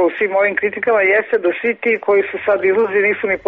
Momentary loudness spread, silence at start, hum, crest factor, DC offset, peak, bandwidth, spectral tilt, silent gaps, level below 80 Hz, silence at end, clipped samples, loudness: 4 LU; 0 s; none; 10 dB; under 0.1%; -4 dBFS; 4.5 kHz; -3 dB/octave; none; -58 dBFS; 0.1 s; under 0.1%; -16 LUFS